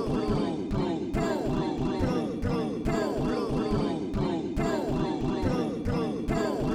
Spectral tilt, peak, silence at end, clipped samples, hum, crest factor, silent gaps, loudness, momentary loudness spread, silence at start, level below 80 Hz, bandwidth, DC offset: -7 dB/octave; -14 dBFS; 0 s; under 0.1%; none; 14 dB; none; -29 LUFS; 2 LU; 0 s; -40 dBFS; 14.5 kHz; under 0.1%